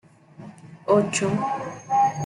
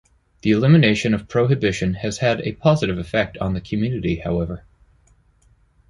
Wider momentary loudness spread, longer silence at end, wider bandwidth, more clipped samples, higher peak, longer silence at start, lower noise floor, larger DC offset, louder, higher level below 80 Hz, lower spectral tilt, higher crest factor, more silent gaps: first, 23 LU vs 10 LU; second, 0 s vs 1.3 s; about the same, 11.5 kHz vs 11 kHz; neither; second, -6 dBFS vs -2 dBFS; about the same, 0.4 s vs 0.45 s; second, -45 dBFS vs -57 dBFS; neither; second, -23 LUFS vs -20 LUFS; second, -62 dBFS vs -42 dBFS; second, -5 dB/octave vs -6.5 dB/octave; about the same, 18 dB vs 18 dB; neither